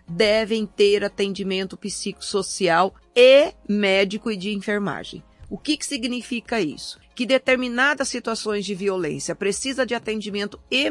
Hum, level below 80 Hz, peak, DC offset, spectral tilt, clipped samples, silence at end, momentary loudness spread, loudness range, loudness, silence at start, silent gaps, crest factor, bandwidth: none; -54 dBFS; -2 dBFS; under 0.1%; -3.5 dB/octave; under 0.1%; 0 s; 10 LU; 5 LU; -22 LUFS; 0.1 s; none; 20 dB; 11.5 kHz